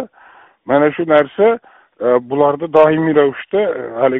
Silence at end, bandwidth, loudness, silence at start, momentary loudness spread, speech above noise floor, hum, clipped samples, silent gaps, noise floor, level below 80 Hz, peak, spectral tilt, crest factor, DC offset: 0 s; 4 kHz; -14 LUFS; 0 s; 8 LU; 32 dB; none; under 0.1%; none; -45 dBFS; -58 dBFS; 0 dBFS; -5 dB/octave; 14 dB; under 0.1%